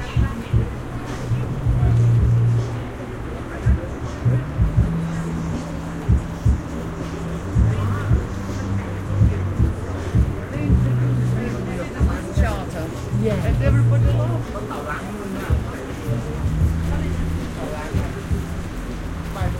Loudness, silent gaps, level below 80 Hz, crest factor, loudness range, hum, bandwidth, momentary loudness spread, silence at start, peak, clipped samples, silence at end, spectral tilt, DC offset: -22 LUFS; none; -28 dBFS; 16 dB; 4 LU; none; 12.5 kHz; 11 LU; 0 s; -4 dBFS; under 0.1%; 0 s; -7.5 dB/octave; under 0.1%